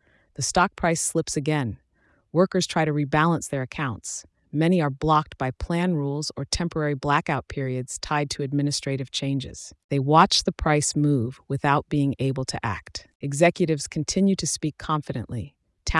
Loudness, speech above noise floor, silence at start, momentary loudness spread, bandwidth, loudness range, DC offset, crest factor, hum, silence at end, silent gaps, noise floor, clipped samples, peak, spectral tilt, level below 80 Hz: -24 LUFS; 40 dB; 0.4 s; 11 LU; 12 kHz; 4 LU; under 0.1%; 20 dB; none; 0 s; 9.84-9.89 s, 13.15-13.20 s; -64 dBFS; under 0.1%; -4 dBFS; -5 dB/octave; -44 dBFS